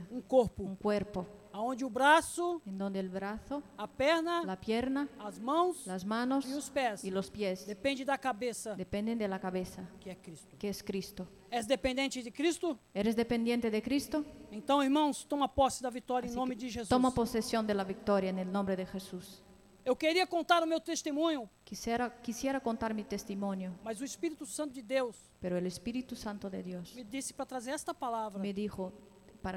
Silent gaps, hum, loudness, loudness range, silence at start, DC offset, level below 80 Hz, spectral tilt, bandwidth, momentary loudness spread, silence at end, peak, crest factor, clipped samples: none; none; -34 LUFS; 6 LU; 0 s; under 0.1%; -60 dBFS; -4.5 dB/octave; 16.5 kHz; 12 LU; 0 s; -14 dBFS; 22 dB; under 0.1%